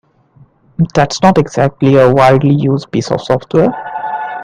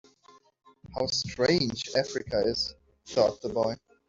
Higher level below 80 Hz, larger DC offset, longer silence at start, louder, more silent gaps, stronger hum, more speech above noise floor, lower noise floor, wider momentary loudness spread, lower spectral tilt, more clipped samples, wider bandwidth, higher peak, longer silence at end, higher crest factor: first, -44 dBFS vs -56 dBFS; neither; about the same, 0.8 s vs 0.85 s; first, -12 LUFS vs -28 LUFS; neither; neither; first, 36 dB vs 32 dB; second, -46 dBFS vs -60 dBFS; first, 12 LU vs 7 LU; first, -7 dB/octave vs -4 dB/octave; first, 0.1% vs under 0.1%; first, 10 kHz vs 7.8 kHz; first, 0 dBFS vs -10 dBFS; second, 0 s vs 0.35 s; second, 12 dB vs 20 dB